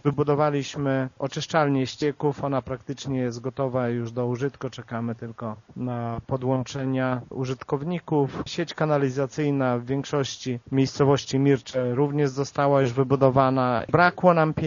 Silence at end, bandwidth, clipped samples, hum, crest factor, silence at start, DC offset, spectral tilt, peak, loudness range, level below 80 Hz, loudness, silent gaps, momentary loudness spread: 0 s; 7.2 kHz; under 0.1%; none; 22 dB; 0.05 s; under 0.1%; -6 dB/octave; -4 dBFS; 7 LU; -56 dBFS; -25 LUFS; none; 11 LU